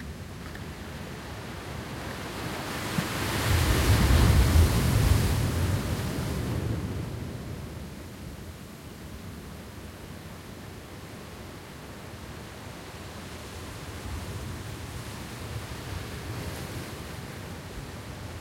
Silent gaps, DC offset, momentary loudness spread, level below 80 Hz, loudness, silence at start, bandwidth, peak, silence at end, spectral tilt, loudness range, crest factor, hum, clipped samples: none; under 0.1%; 19 LU; -36 dBFS; -30 LUFS; 0 s; 16.5 kHz; -10 dBFS; 0 s; -5 dB/octave; 18 LU; 20 dB; none; under 0.1%